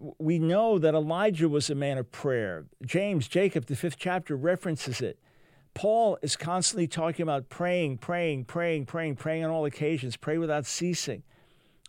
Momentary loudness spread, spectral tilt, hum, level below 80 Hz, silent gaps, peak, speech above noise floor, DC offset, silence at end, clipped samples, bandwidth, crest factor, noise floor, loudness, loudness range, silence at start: 7 LU; -5 dB/octave; none; -68 dBFS; none; -12 dBFS; 34 dB; under 0.1%; 0.65 s; under 0.1%; 16.5 kHz; 16 dB; -62 dBFS; -29 LUFS; 3 LU; 0 s